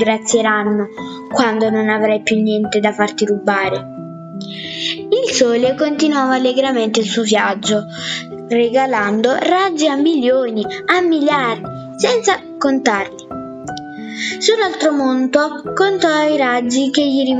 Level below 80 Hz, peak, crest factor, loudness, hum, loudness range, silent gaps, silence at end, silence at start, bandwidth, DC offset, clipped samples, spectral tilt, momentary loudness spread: -60 dBFS; 0 dBFS; 16 dB; -15 LUFS; none; 3 LU; none; 0 s; 0 s; 9.4 kHz; under 0.1%; under 0.1%; -3.5 dB/octave; 11 LU